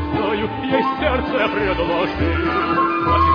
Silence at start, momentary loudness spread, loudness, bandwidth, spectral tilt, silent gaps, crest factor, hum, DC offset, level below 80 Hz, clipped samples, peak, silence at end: 0 s; 3 LU; -19 LUFS; 5.2 kHz; -8 dB/octave; none; 14 dB; none; under 0.1%; -32 dBFS; under 0.1%; -4 dBFS; 0 s